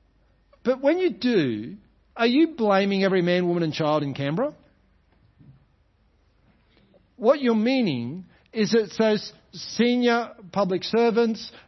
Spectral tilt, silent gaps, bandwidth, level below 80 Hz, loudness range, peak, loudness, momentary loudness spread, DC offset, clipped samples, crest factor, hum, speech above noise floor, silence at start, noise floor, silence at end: -6 dB/octave; none; 6.2 kHz; -64 dBFS; 7 LU; -6 dBFS; -23 LUFS; 12 LU; under 0.1%; under 0.1%; 18 dB; none; 40 dB; 0.65 s; -63 dBFS; 0.1 s